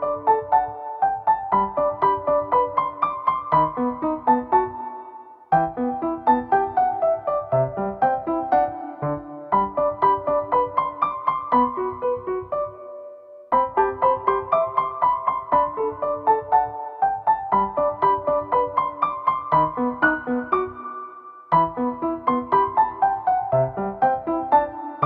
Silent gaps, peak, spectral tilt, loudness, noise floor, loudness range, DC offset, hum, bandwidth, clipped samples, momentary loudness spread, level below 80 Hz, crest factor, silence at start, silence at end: none; -4 dBFS; -10 dB/octave; -22 LUFS; -42 dBFS; 2 LU; under 0.1%; none; 4.8 kHz; under 0.1%; 8 LU; -52 dBFS; 18 dB; 0 s; 0 s